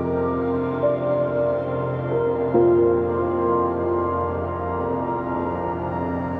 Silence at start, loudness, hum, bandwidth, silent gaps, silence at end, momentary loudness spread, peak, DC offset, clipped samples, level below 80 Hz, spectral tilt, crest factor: 0 s; -22 LUFS; none; 4.4 kHz; none; 0 s; 7 LU; -6 dBFS; under 0.1%; under 0.1%; -46 dBFS; -11 dB/octave; 16 dB